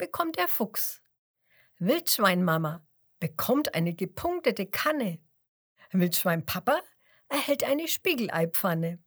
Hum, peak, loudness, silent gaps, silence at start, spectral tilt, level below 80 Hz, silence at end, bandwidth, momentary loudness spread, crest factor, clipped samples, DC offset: none; -6 dBFS; -27 LUFS; 1.18-1.34 s, 5.48-5.76 s; 0 s; -4.5 dB/octave; -64 dBFS; 0.1 s; over 20 kHz; 8 LU; 22 dB; under 0.1%; under 0.1%